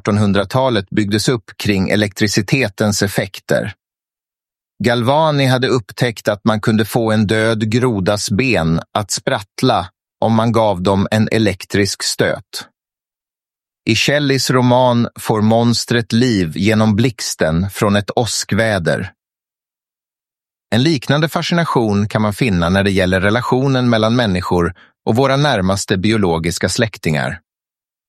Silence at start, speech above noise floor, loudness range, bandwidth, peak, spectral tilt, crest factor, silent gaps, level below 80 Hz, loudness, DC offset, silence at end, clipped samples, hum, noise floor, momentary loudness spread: 0.05 s; over 75 dB; 4 LU; 14.5 kHz; 0 dBFS; -5 dB/octave; 16 dB; none; -44 dBFS; -15 LUFS; under 0.1%; 0.7 s; under 0.1%; none; under -90 dBFS; 6 LU